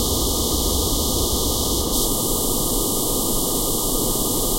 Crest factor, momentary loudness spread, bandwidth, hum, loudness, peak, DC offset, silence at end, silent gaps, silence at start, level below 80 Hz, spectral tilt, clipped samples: 14 dB; 0 LU; 16 kHz; none; -20 LUFS; -8 dBFS; 0.8%; 0 s; none; 0 s; -28 dBFS; -3.5 dB/octave; under 0.1%